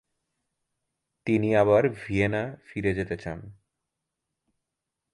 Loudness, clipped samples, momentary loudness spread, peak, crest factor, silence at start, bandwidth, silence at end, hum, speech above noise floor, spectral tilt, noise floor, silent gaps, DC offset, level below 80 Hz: -25 LUFS; under 0.1%; 15 LU; -8 dBFS; 20 dB; 1.25 s; 11.5 kHz; 1.6 s; none; 60 dB; -8 dB/octave; -85 dBFS; none; under 0.1%; -52 dBFS